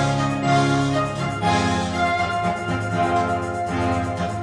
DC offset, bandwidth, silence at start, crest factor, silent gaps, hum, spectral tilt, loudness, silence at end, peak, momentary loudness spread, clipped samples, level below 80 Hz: under 0.1%; 10.5 kHz; 0 s; 14 dB; none; none; -5.5 dB/octave; -21 LUFS; 0 s; -6 dBFS; 5 LU; under 0.1%; -44 dBFS